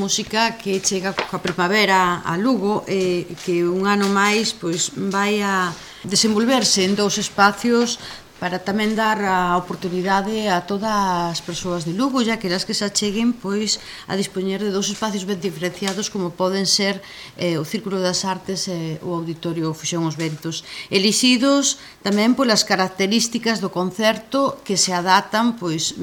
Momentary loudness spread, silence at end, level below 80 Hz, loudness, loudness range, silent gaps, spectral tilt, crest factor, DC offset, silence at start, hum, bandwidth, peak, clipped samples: 9 LU; 0 s; -54 dBFS; -20 LUFS; 4 LU; none; -3.5 dB/octave; 20 dB; under 0.1%; 0 s; none; 18 kHz; 0 dBFS; under 0.1%